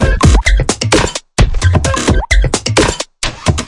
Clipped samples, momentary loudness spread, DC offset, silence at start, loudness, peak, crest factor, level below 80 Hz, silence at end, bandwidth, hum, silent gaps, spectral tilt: 0.1%; 6 LU; under 0.1%; 0 s; -13 LUFS; 0 dBFS; 12 dB; -16 dBFS; 0 s; 11.5 kHz; none; none; -4.5 dB/octave